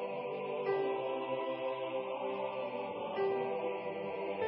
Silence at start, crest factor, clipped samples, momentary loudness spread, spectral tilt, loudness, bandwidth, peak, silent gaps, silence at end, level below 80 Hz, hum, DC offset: 0 s; 14 dB; under 0.1%; 5 LU; -3.5 dB/octave; -37 LUFS; 5.4 kHz; -22 dBFS; none; 0 s; -82 dBFS; none; under 0.1%